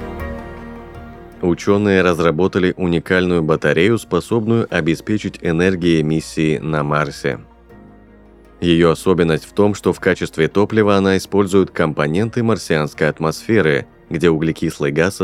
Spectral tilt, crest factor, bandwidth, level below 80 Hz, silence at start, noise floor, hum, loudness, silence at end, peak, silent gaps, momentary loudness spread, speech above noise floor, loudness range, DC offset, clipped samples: -6.5 dB/octave; 16 dB; 15.5 kHz; -42 dBFS; 0 s; -44 dBFS; none; -17 LUFS; 0 s; 0 dBFS; none; 9 LU; 28 dB; 3 LU; under 0.1%; under 0.1%